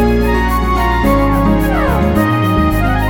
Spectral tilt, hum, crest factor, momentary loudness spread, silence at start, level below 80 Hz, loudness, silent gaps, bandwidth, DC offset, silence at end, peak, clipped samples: -7 dB/octave; none; 12 dB; 2 LU; 0 s; -18 dBFS; -13 LUFS; none; 18 kHz; under 0.1%; 0 s; 0 dBFS; under 0.1%